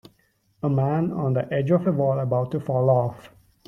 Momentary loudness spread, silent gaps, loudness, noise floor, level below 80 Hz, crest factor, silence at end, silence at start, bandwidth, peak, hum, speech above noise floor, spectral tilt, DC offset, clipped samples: 5 LU; none; -23 LUFS; -65 dBFS; -60 dBFS; 16 dB; 0.4 s; 0.65 s; 4.7 kHz; -8 dBFS; none; 43 dB; -10.5 dB/octave; under 0.1%; under 0.1%